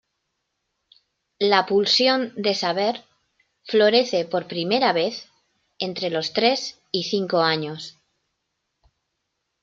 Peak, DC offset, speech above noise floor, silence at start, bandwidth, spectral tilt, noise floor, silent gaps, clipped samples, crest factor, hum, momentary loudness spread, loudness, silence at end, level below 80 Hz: -4 dBFS; under 0.1%; 56 dB; 1.4 s; 7.8 kHz; -4 dB/octave; -78 dBFS; none; under 0.1%; 20 dB; none; 12 LU; -21 LUFS; 1.7 s; -72 dBFS